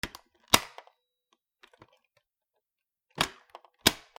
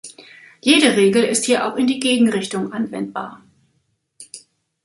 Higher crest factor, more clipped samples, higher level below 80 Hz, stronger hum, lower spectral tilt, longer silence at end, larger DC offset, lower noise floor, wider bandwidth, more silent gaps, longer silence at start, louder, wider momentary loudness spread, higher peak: first, 34 dB vs 20 dB; neither; first, -58 dBFS vs -64 dBFS; neither; second, -1.5 dB/octave vs -3.5 dB/octave; second, 0.25 s vs 0.45 s; neither; first, -88 dBFS vs -67 dBFS; first, over 20 kHz vs 11.5 kHz; neither; about the same, 0.05 s vs 0.05 s; second, -27 LUFS vs -17 LUFS; second, 20 LU vs 23 LU; about the same, 0 dBFS vs 0 dBFS